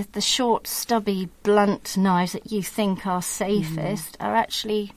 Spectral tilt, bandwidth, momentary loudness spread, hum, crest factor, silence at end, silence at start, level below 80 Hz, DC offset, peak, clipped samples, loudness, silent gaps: -4.5 dB/octave; 16 kHz; 8 LU; none; 16 dB; 0.05 s; 0 s; -56 dBFS; under 0.1%; -6 dBFS; under 0.1%; -23 LUFS; none